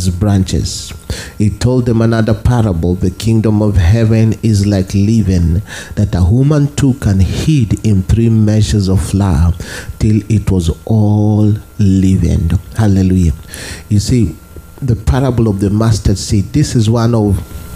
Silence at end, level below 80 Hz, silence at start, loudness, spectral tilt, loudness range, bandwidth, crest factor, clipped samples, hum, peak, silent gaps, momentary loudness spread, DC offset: 0 s; -26 dBFS; 0 s; -12 LUFS; -7 dB/octave; 2 LU; 15 kHz; 12 dB; under 0.1%; none; 0 dBFS; none; 7 LU; under 0.1%